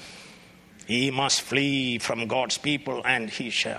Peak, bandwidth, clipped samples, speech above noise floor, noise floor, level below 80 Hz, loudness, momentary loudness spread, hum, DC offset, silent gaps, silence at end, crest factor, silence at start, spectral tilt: -6 dBFS; 15 kHz; under 0.1%; 25 dB; -51 dBFS; -64 dBFS; -25 LUFS; 6 LU; none; under 0.1%; none; 0 s; 20 dB; 0 s; -3 dB/octave